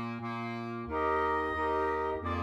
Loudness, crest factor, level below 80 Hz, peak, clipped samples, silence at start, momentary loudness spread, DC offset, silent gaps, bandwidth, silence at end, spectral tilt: -32 LUFS; 14 dB; -54 dBFS; -20 dBFS; under 0.1%; 0 s; 7 LU; under 0.1%; none; 12.5 kHz; 0 s; -7.5 dB/octave